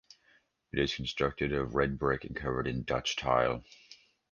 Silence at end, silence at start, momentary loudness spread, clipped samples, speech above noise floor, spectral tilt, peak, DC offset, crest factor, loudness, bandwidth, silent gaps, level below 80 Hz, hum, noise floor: 0.35 s; 0.75 s; 5 LU; under 0.1%; 37 dB; -5 dB/octave; -12 dBFS; under 0.1%; 22 dB; -32 LUFS; 9.8 kHz; none; -50 dBFS; none; -68 dBFS